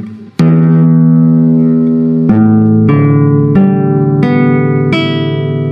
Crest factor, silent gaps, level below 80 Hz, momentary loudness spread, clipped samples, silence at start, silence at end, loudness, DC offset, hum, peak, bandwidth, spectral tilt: 8 dB; none; -44 dBFS; 5 LU; 0.1%; 0 s; 0 s; -9 LUFS; under 0.1%; none; 0 dBFS; 5.6 kHz; -10 dB/octave